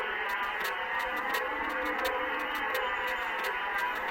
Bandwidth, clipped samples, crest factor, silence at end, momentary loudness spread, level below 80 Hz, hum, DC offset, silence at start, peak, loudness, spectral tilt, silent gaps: 16.5 kHz; under 0.1%; 16 dB; 0 s; 1 LU; -58 dBFS; none; under 0.1%; 0 s; -18 dBFS; -31 LUFS; -2 dB/octave; none